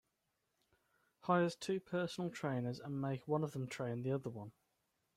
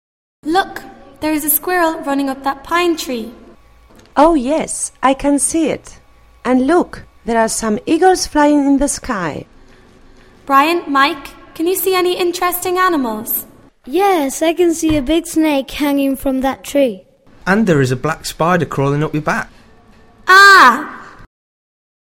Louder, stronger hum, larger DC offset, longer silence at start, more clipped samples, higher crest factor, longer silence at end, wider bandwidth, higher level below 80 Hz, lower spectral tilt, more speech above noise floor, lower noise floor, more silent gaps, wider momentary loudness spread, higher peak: second, -40 LUFS vs -14 LUFS; neither; neither; first, 1.25 s vs 0.45 s; second, under 0.1% vs 0.1%; about the same, 20 dB vs 16 dB; second, 0.65 s vs 0.85 s; second, 14.5 kHz vs 16.5 kHz; second, -80 dBFS vs -40 dBFS; first, -6.5 dB/octave vs -4 dB/octave; first, 46 dB vs 31 dB; first, -85 dBFS vs -45 dBFS; neither; about the same, 11 LU vs 12 LU; second, -20 dBFS vs 0 dBFS